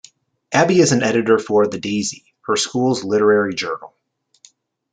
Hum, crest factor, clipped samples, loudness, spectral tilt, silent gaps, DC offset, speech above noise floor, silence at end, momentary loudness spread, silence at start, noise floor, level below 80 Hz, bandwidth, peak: none; 16 dB; under 0.1%; -17 LUFS; -4.5 dB/octave; none; under 0.1%; 36 dB; 1.05 s; 11 LU; 0.5 s; -53 dBFS; -62 dBFS; 9.4 kHz; -2 dBFS